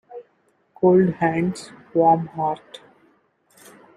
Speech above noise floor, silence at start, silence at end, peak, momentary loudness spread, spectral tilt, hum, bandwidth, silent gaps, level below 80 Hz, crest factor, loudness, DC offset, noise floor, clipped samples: 45 dB; 0.1 s; 1.2 s; -4 dBFS; 19 LU; -7.5 dB/octave; none; 12 kHz; none; -64 dBFS; 18 dB; -20 LUFS; under 0.1%; -64 dBFS; under 0.1%